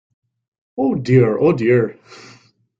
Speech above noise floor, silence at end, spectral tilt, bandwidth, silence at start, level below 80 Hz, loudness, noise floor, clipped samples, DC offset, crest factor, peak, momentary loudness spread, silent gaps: 34 dB; 0.65 s; -9 dB/octave; 7.6 kHz; 0.75 s; -58 dBFS; -16 LUFS; -50 dBFS; under 0.1%; under 0.1%; 16 dB; -2 dBFS; 10 LU; none